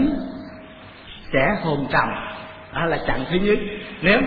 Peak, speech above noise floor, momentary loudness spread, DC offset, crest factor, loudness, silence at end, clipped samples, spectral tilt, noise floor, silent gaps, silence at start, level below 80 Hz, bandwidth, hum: -2 dBFS; 21 dB; 20 LU; under 0.1%; 20 dB; -22 LUFS; 0 s; under 0.1%; -9 dB/octave; -41 dBFS; none; 0 s; -38 dBFS; 5 kHz; none